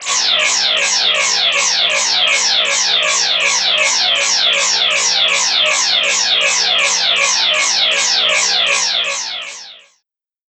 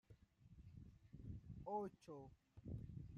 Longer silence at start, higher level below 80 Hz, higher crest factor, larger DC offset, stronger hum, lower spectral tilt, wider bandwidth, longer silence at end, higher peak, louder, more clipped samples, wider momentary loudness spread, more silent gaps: about the same, 0 s vs 0.1 s; first, -58 dBFS vs -66 dBFS; second, 14 dB vs 20 dB; neither; neither; second, 2.5 dB/octave vs -9 dB/octave; first, 15 kHz vs 7.2 kHz; first, 0.7 s vs 0 s; first, -2 dBFS vs -36 dBFS; first, -11 LUFS vs -55 LUFS; neither; second, 1 LU vs 16 LU; neither